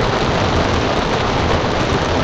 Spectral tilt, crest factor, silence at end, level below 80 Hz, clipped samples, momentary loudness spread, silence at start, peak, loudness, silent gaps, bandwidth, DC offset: -5.5 dB/octave; 12 dB; 0 s; -26 dBFS; under 0.1%; 1 LU; 0 s; -4 dBFS; -17 LUFS; none; 9.8 kHz; under 0.1%